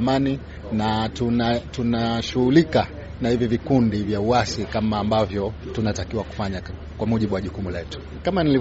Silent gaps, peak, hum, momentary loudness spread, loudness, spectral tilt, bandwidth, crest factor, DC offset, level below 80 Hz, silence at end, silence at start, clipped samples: none; -4 dBFS; none; 9 LU; -23 LUFS; -5.5 dB/octave; 8 kHz; 18 dB; under 0.1%; -38 dBFS; 0 s; 0 s; under 0.1%